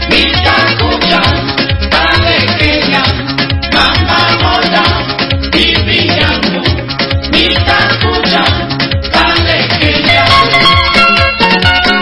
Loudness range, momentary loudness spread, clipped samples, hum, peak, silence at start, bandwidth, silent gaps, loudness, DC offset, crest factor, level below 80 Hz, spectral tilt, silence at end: 2 LU; 7 LU; 0.6%; none; 0 dBFS; 0 s; 11 kHz; none; -8 LUFS; under 0.1%; 10 dB; -22 dBFS; -5.5 dB/octave; 0 s